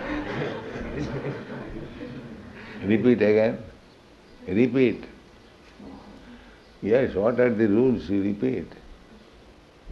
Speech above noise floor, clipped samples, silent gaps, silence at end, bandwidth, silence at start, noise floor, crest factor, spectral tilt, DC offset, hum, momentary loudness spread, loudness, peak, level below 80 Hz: 30 dB; under 0.1%; none; 0 s; 7.2 kHz; 0 s; -51 dBFS; 18 dB; -8.5 dB/octave; under 0.1%; none; 23 LU; -24 LUFS; -8 dBFS; -50 dBFS